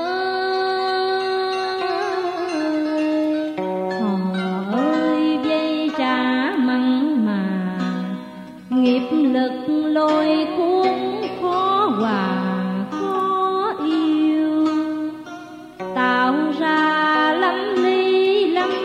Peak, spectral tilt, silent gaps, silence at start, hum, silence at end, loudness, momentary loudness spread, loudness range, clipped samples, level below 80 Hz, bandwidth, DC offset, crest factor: -6 dBFS; -6.5 dB/octave; none; 0 s; 50 Hz at -60 dBFS; 0 s; -20 LUFS; 7 LU; 3 LU; under 0.1%; -64 dBFS; 9.6 kHz; under 0.1%; 14 dB